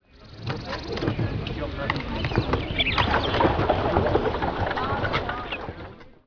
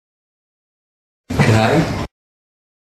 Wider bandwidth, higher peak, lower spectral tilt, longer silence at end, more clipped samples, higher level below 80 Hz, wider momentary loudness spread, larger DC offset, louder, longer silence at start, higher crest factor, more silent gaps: second, 5.4 kHz vs 14 kHz; second, -4 dBFS vs 0 dBFS; about the same, -7 dB/octave vs -6 dB/octave; second, 0.15 s vs 0.95 s; neither; about the same, -36 dBFS vs -40 dBFS; about the same, 11 LU vs 13 LU; neither; second, -25 LUFS vs -16 LUFS; second, 0.15 s vs 1.3 s; about the same, 22 dB vs 20 dB; neither